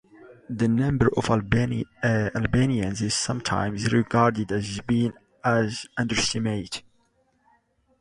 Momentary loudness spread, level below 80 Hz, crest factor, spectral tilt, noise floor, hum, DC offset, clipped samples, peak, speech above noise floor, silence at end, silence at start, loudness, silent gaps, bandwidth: 7 LU; -46 dBFS; 20 dB; -5.5 dB/octave; -66 dBFS; none; under 0.1%; under 0.1%; -4 dBFS; 43 dB; 1.2 s; 0.25 s; -24 LUFS; none; 11.5 kHz